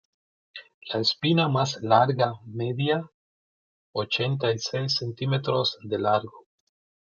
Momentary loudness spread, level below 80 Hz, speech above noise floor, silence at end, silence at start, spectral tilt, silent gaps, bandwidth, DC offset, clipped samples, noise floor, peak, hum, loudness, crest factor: 16 LU; -68 dBFS; over 65 dB; 0.65 s; 0.55 s; -5.5 dB/octave; 0.74-0.81 s, 3.14-3.93 s; 7.2 kHz; under 0.1%; under 0.1%; under -90 dBFS; -4 dBFS; none; -25 LUFS; 22 dB